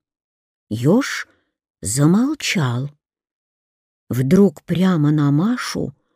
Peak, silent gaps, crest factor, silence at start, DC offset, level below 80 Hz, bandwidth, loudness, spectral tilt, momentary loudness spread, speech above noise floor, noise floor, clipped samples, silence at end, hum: -4 dBFS; 1.70-1.74 s, 3.31-4.07 s; 16 dB; 0.7 s; under 0.1%; -54 dBFS; 15.5 kHz; -18 LUFS; -6 dB/octave; 13 LU; over 73 dB; under -90 dBFS; under 0.1%; 0.25 s; none